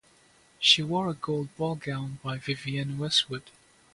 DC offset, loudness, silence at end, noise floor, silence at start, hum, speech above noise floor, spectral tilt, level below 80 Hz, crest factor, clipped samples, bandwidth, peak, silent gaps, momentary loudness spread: under 0.1%; -27 LUFS; 0.45 s; -60 dBFS; 0.6 s; none; 32 dB; -4 dB/octave; -64 dBFS; 24 dB; under 0.1%; 11.5 kHz; -6 dBFS; none; 13 LU